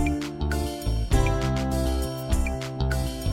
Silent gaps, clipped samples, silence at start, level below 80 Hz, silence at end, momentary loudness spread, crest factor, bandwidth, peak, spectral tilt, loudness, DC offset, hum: none; under 0.1%; 0 s; -28 dBFS; 0 s; 5 LU; 16 dB; 16.5 kHz; -8 dBFS; -6 dB/octave; -27 LUFS; under 0.1%; none